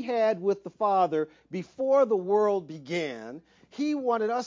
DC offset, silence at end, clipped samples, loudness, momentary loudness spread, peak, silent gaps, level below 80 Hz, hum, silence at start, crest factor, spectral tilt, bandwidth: under 0.1%; 0 s; under 0.1%; -27 LUFS; 14 LU; -12 dBFS; none; -76 dBFS; none; 0 s; 16 dB; -6 dB/octave; 7.6 kHz